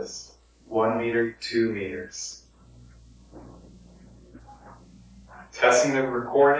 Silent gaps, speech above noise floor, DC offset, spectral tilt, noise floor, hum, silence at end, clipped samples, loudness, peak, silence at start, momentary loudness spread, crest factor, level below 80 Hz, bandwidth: none; 29 dB; under 0.1%; -4 dB/octave; -52 dBFS; none; 0 s; under 0.1%; -25 LUFS; -6 dBFS; 0 s; 24 LU; 22 dB; -56 dBFS; 8 kHz